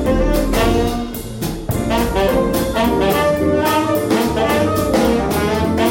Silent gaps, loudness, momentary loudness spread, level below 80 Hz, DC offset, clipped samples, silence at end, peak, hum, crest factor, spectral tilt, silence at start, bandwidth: none; -17 LUFS; 6 LU; -26 dBFS; under 0.1%; under 0.1%; 0 s; -4 dBFS; none; 12 dB; -5.5 dB/octave; 0 s; 17 kHz